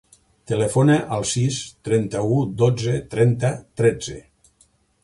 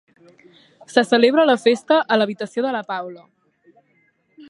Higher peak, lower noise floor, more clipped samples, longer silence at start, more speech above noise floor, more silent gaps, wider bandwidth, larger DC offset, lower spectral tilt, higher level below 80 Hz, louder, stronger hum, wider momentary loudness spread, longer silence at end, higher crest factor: second, -4 dBFS vs 0 dBFS; about the same, -60 dBFS vs -63 dBFS; neither; second, 0.5 s vs 0.9 s; second, 40 dB vs 45 dB; neither; about the same, 11.5 kHz vs 11.5 kHz; neither; first, -6 dB/octave vs -4.5 dB/octave; first, -50 dBFS vs -76 dBFS; second, -21 LUFS vs -18 LUFS; neither; second, 9 LU vs 13 LU; second, 0.85 s vs 1.35 s; about the same, 16 dB vs 20 dB